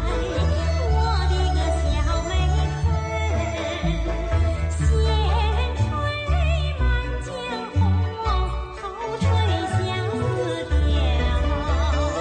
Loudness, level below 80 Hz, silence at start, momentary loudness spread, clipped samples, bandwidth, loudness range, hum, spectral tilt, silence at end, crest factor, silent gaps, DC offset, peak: -23 LUFS; -24 dBFS; 0 s; 5 LU; under 0.1%; 9.2 kHz; 2 LU; none; -6 dB/octave; 0 s; 12 dB; none; under 0.1%; -10 dBFS